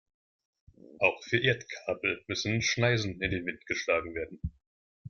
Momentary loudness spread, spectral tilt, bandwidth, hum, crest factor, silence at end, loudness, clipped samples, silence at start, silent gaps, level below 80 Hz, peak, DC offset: 11 LU; -4.5 dB/octave; 7.2 kHz; none; 22 dB; 0 s; -30 LUFS; under 0.1%; 0.9 s; 4.67-5.05 s; -54 dBFS; -10 dBFS; under 0.1%